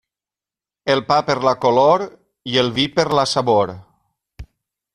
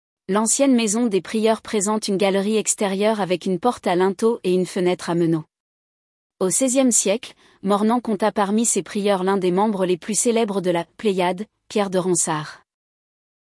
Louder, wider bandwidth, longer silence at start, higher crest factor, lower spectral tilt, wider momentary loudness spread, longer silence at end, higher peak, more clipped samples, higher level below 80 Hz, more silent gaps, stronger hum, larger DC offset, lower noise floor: first, -17 LUFS vs -20 LUFS; about the same, 11.5 kHz vs 12 kHz; first, 0.85 s vs 0.3 s; about the same, 18 dB vs 16 dB; about the same, -4.5 dB/octave vs -4 dB/octave; first, 10 LU vs 7 LU; second, 0.5 s vs 0.95 s; about the same, -2 dBFS vs -4 dBFS; neither; first, -50 dBFS vs -66 dBFS; second, none vs 5.60-6.30 s; neither; neither; about the same, under -90 dBFS vs under -90 dBFS